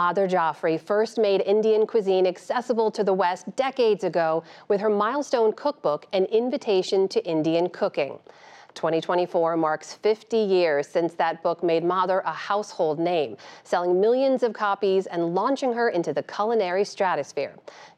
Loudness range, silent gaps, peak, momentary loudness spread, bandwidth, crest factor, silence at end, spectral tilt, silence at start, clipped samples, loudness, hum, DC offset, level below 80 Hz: 2 LU; none; -10 dBFS; 6 LU; 9.8 kHz; 14 dB; 0.1 s; -5.5 dB/octave; 0 s; under 0.1%; -24 LUFS; none; under 0.1%; -82 dBFS